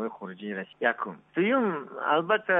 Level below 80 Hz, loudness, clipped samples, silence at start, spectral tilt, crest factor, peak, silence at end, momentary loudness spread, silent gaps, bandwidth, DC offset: -80 dBFS; -28 LUFS; under 0.1%; 0 s; -8.5 dB/octave; 18 dB; -10 dBFS; 0 s; 11 LU; none; 3.9 kHz; under 0.1%